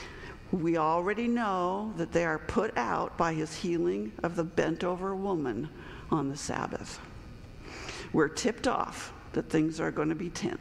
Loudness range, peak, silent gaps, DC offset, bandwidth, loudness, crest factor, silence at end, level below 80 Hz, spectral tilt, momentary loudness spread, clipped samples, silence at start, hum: 4 LU; -12 dBFS; none; under 0.1%; 13 kHz; -31 LUFS; 18 dB; 0 s; -52 dBFS; -5.5 dB/octave; 13 LU; under 0.1%; 0 s; none